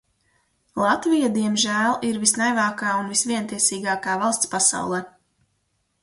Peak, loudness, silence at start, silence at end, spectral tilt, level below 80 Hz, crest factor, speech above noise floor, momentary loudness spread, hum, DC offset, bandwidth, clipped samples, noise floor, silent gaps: -2 dBFS; -21 LUFS; 0.75 s; 0.95 s; -2.5 dB/octave; -64 dBFS; 22 dB; 49 dB; 6 LU; none; under 0.1%; 11.5 kHz; under 0.1%; -71 dBFS; none